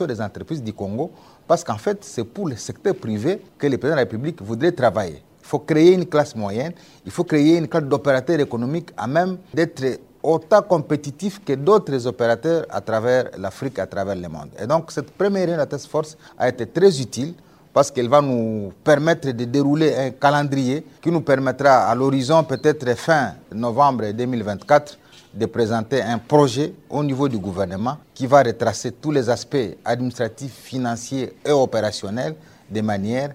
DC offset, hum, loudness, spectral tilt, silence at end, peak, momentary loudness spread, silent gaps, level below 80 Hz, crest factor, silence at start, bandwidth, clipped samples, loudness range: under 0.1%; none; -20 LUFS; -6 dB/octave; 0 s; 0 dBFS; 11 LU; none; -58 dBFS; 20 dB; 0 s; 16 kHz; under 0.1%; 5 LU